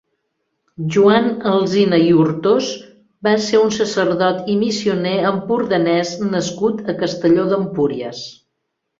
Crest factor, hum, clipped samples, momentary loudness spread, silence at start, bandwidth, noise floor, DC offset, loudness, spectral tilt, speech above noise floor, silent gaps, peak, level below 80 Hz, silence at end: 16 dB; none; under 0.1%; 9 LU; 0.8 s; 7.8 kHz; -75 dBFS; under 0.1%; -17 LUFS; -5.5 dB/octave; 58 dB; none; 0 dBFS; -58 dBFS; 0.65 s